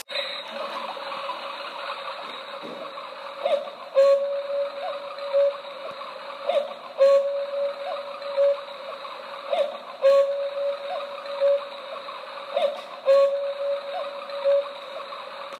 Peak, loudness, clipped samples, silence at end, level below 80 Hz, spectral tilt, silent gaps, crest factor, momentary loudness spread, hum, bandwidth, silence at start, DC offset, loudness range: -10 dBFS; -26 LUFS; under 0.1%; 0 s; under -90 dBFS; -2 dB/octave; none; 16 dB; 16 LU; none; 10.5 kHz; 0.1 s; under 0.1%; 1 LU